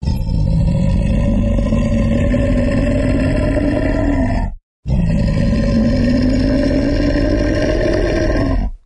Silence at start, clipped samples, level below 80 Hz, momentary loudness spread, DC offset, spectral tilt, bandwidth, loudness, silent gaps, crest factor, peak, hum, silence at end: 0 s; under 0.1%; -20 dBFS; 3 LU; under 0.1%; -8 dB/octave; 10 kHz; -16 LUFS; 4.63-4.83 s; 12 dB; -2 dBFS; none; 0.1 s